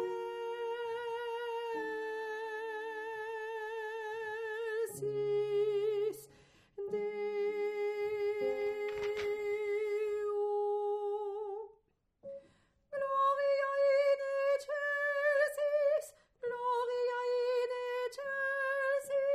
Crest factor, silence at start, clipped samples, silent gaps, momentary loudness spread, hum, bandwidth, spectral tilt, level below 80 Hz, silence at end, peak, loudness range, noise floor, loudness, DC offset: 16 dB; 0 s; under 0.1%; none; 10 LU; none; 15 kHz; -3.5 dB/octave; -76 dBFS; 0 s; -20 dBFS; 7 LU; -72 dBFS; -35 LUFS; under 0.1%